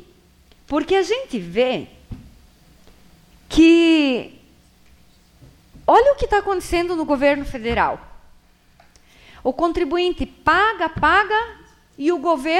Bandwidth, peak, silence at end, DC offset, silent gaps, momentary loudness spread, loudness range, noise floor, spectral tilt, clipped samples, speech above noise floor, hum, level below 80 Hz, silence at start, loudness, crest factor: 12.5 kHz; -4 dBFS; 0 s; under 0.1%; none; 12 LU; 5 LU; -53 dBFS; -5 dB/octave; under 0.1%; 35 dB; none; -40 dBFS; 0.7 s; -18 LUFS; 18 dB